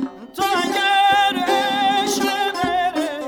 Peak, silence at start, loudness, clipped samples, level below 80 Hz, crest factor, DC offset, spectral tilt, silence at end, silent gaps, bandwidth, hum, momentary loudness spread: -6 dBFS; 0 s; -18 LUFS; under 0.1%; -56 dBFS; 14 dB; under 0.1%; -2 dB/octave; 0 s; none; 20 kHz; none; 6 LU